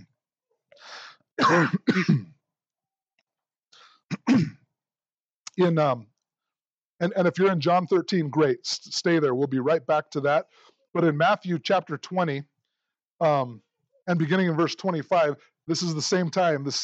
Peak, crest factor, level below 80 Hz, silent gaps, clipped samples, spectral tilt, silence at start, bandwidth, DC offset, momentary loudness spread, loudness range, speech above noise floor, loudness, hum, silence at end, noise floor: -8 dBFS; 16 dB; -74 dBFS; 1.32-1.37 s, 3.14-3.18 s, 5.25-5.29 s, 5.36-5.45 s, 6.74-6.78 s, 6.85-6.99 s, 13.05-13.19 s; under 0.1%; -5.5 dB/octave; 0.85 s; 8.2 kHz; under 0.1%; 11 LU; 4 LU; over 66 dB; -24 LUFS; none; 0 s; under -90 dBFS